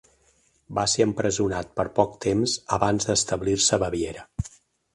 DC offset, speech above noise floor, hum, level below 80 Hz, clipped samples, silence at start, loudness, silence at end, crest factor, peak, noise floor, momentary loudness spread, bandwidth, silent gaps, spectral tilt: under 0.1%; 40 dB; none; -46 dBFS; under 0.1%; 0.7 s; -24 LUFS; 0.45 s; 22 dB; -4 dBFS; -64 dBFS; 11 LU; 11.5 kHz; none; -3.5 dB/octave